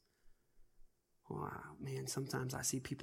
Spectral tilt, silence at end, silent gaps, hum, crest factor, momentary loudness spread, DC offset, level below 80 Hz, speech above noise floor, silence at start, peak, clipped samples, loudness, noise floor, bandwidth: -4 dB/octave; 0 s; none; none; 20 dB; 9 LU; under 0.1%; -68 dBFS; 25 dB; 0.25 s; -26 dBFS; under 0.1%; -43 LUFS; -67 dBFS; 16.5 kHz